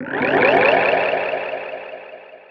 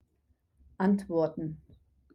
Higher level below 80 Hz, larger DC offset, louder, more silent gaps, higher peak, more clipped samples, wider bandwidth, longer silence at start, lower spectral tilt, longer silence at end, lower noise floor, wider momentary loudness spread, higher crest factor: about the same, -60 dBFS vs -62 dBFS; neither; first, -17 LUFS vs -31 LUFS; neither; first, -2 dBFS vs -14 dBFS; neither; second, 6.4 kHz vs 10.5 kHz; second, 0 s vs 0.8 s; second, -6.5 dB/octave vs -9 dB/octave; second, 0.15 s vs 0.6 s; second, -39 dBFS vs -72 dBFS; first, 21 LU vs 12 LU; about the same, 18 dB vs 18 dB